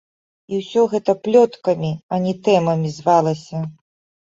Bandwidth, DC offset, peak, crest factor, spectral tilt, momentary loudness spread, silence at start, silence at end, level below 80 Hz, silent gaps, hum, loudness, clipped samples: 7.8 kHz; under 0.1%; -2 dBFS; 16 dB; -7 dB/octave; 12 LU; 0.5 s; 0.5 s; -62 dBFS; 2.03-2.09 s; none; -19 LUFS; under 0.1%